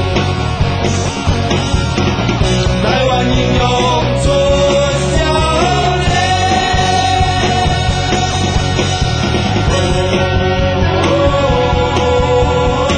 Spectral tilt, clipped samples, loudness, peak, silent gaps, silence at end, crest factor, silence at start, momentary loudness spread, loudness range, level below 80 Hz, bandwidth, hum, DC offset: -5 dB/octave; under 0.1%; -13 LUFS; 0 dBFS; none; 0 s; 12 dB; 0 s; 3 LU; 1 LU; -22 dBFS; 11 kHz; none; under 0.1%